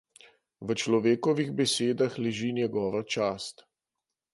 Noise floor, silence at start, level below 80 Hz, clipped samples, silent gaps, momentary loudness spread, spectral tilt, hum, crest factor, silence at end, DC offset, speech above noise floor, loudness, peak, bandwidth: -88 dBFS; 0.6 s; -68 dBFS; under 0.1%; none; 8 LU; -4.5 dB/octave; none; 18 dB; 0.8 s; under 0.1%; 60 dB; -28 LUFS; -12 dBFS; 11.5 kHz